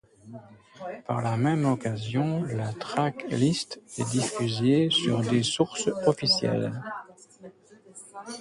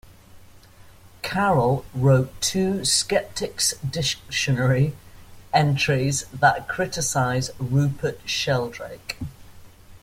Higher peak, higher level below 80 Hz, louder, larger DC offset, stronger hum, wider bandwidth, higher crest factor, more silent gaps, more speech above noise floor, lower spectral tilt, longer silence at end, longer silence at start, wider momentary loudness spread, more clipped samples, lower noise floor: second, -8 dBFS vs -2 dBFS; second, -62 dBFS vs -48 dBFS; second, -26 LUFS vs -22 LUFS; neither; neither; second, 11.5 kHz vs 16 kHz; about the same, 20 dB vs 20 dB; neither; about the same, 25 dB vs 25 dB; about the same, -5 dB/octave vs -4 dB/octave; about the same, 0 s vs 0.05 s; first, 0.25 s vs 0.05 s; first, 18 LU vs 10 LU; neither; first, -52 dBFS vs -48 dBFS